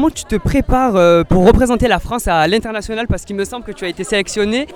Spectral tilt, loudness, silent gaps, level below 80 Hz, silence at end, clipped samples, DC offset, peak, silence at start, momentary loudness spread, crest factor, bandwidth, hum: -5.5 dB/octave; -15 LUFS; none; -26 dBFS; 0 s; under 0.1%; under 0.1%; 0 dBFS; 0 s; 12 LU; 14 dB; 17.5 kHz; none